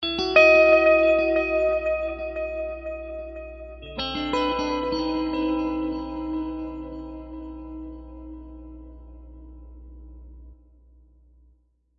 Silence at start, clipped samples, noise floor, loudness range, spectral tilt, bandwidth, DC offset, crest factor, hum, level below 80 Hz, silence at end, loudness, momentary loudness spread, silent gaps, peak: 0 s; under 0.1%; -62 dBFS; 23 LU; -5.5 dB/octave; 7.4 kHz; under 0.1%; 22 dB; 60 Hz at -45 dBFS; -44 dBFS; 1.45 s; -22 LUFS; 25 LU; none; -4 dBFS